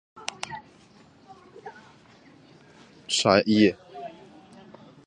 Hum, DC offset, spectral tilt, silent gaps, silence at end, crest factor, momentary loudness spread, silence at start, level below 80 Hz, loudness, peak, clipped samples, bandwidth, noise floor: none; under 0.1%; -4 dB/octave; none; 0.95 s; 26 dB; 25 LU; 0.15 s; -62 dBFS; -23 LUFS; -4 dBFS; under 0.1%; 11 kHz; -55 dBFS